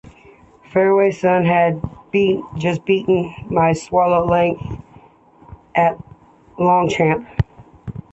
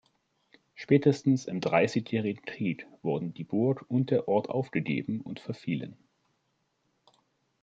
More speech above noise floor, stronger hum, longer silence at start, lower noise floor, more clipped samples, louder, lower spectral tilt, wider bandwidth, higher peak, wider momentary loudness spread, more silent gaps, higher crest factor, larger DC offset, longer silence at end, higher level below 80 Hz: second, 32 dB vs 47 dB; neither; about the same, 0.75 s vs 0.75 s; second, -48 dBFS vs -76 dBFS; neither; first, -17 LUFS vs -29 LUFS; about the same, -7 dB/octave vs -7.5 dB/octave; about the same, 8.2 kHz vs 7.8 kHz; first, -2 dBFS vs -10 dBFS; about the same, 13 LU vs 11 LU; neither; second, 16 dB vs 22 dB; neither; second, 0.1 s vs 1.7 s; first, -42 dBFS vs -72 dBFS